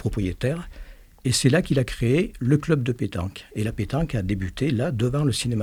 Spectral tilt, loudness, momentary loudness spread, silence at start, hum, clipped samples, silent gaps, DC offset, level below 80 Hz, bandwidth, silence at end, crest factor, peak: -6 dB/octave; -24 LUFS; 9 LU; 0 s; none; under 0.1%; none; under 0.1%; -40 dBFS; 16 kHz; 0 s; 18 dB; -6 dBFS